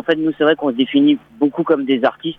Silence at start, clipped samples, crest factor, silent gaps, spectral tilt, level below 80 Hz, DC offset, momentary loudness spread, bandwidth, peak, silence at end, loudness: 0.05 s; under 0.1%; 14 dB; none; -8 dB/octave; -60 dBFS; under 0.1%; 4 LU; 4.4 kHz; -2 dBFS; 0.05 s; -16 LUFS